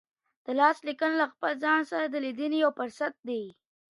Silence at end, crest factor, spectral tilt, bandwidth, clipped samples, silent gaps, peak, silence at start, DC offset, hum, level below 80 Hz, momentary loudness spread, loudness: 0.5 s; 20 dB; -4 dB/octave; 11.5 kHz; under 0.1%; 3.19-3.23 s; -8 dBFS; 0.5 s; under 0.1%; none; -84 dBFS; 11 LU; -28 LUFS